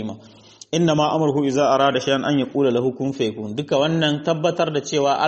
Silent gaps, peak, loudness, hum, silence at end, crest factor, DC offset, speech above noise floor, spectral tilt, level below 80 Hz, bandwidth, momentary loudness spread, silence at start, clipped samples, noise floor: none; -4 dBFS; -20 LUFS; none; 0 s; 16 dB; under 0.1%; 26 dB; -5.5 dB/octave; -60 dBFS; 8.4 kHz; 7 LU; 0 s; under 0.1%; -45 dBFS